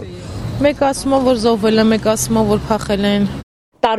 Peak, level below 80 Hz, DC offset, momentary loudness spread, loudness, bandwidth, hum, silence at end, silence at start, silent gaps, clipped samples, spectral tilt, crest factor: -2 dBFS; -36 dBFS; under 0.1%; 11 LU; -15 LUFS; 13.5 kHz; none; 0 s; 0 s; 3.43-3.72 s; under 0.1%; -5 dB/octave; 14 dB